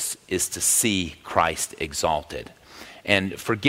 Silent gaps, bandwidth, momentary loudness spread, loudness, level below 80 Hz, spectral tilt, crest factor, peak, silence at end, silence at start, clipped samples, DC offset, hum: none; 16 kHz; 18 LU; -23 LUFS; -50 dBFS; -2.5 dB/octave; 24 dB; -2 dBFS; 0 s; 0 s; under 0.1%; under 0.1%; none